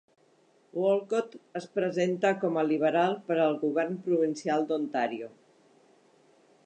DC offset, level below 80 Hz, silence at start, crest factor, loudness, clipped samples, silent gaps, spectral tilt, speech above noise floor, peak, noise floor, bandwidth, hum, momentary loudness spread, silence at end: under 0.1%; -86 dBFS; 0.75 s; 16 dB; -28 LUFS; under 0.1%; none; -6 dB/octave; 36 dB; -14 dBFS; -64 dBFS; 9.2 kHz; none; 10 LU; 1.35 s